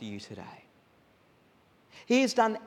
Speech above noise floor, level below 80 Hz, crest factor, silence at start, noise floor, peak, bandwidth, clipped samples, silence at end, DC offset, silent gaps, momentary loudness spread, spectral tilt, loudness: 35 dB; -80 dBFS; 22 dB; 0 s; -64 dBFS; -10 dBFS; 12.5 kHz; under 0.1%; 0 s; under 0.1%; none; 22 LU; -4 dB/octave; -28 LUFS